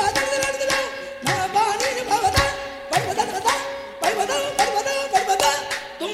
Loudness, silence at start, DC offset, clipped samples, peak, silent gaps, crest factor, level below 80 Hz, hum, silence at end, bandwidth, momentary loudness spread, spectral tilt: -22 LUFS; 0 s; under 0.1%; under 0.1%; -4 dBFS; none; 18 dB; -44 dBFS; none; 0 s; 16.5 kHz; 6 LU; -2 dB/octave